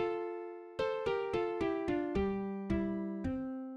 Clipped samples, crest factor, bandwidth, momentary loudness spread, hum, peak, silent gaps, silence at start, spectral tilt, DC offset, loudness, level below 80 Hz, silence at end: under 0.1%; 14 dB; 9.2 kHz; 5 LU; none; -22 dBFS; none; 0 s; -8 dB/octave; under 0.1%; -36 LUFS; -52 dBFS; 0 s